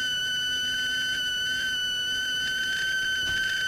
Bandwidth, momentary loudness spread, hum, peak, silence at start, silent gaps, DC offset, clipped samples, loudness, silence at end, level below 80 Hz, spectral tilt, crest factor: 16.5 kHz; 1 LU; none; -18 dBFS; 0 s; none; under 0.1%; under 0.1%; -25 LUFS; 0 s; -54 dBFS; 0.5 dB/octave; 10 dB